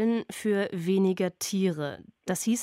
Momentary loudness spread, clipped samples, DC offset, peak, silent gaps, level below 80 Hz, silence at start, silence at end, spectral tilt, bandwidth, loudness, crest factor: 9 LU; under 0.1%; under 0.1%; -16 dBFS; none; -72 dBFS; 0 s; 0 s; -5 dB/octave; 16 kHz; -28 LUFS; 12 dB